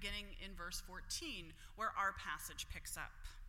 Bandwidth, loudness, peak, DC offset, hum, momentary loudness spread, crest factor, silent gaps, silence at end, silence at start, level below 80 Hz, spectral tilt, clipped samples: 16.5 kHz; -45 LUFS; -28 dBFS; under 0.1%; none; 10 LU; 20 dB; none; 0 s; 0 s; -54 dBFS; -1.5 dB/octave; under 0.1%